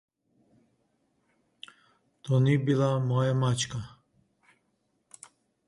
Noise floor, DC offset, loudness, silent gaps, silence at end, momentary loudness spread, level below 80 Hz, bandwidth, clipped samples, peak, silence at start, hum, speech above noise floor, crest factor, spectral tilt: -75 dBFS; under 0.1%; -27 LUFS; none; 1.8 s; 25 LU; -64 dBFS; 11 kHz; under 0.1%; -12 dBFS; 2.25 s; none; 49 dB; 18 dB; -6 dB/octave